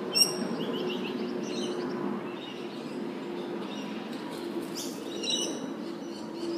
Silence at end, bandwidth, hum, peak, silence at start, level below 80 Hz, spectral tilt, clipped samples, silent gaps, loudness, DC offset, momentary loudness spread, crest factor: 0 s; 15.5 kHz; none; -8 dBFS; 0 s; -80 dBFS; -3 dB/octave; under 0.1%; none; -33 LUFS; under 0.1%; 9 LU; 24 dB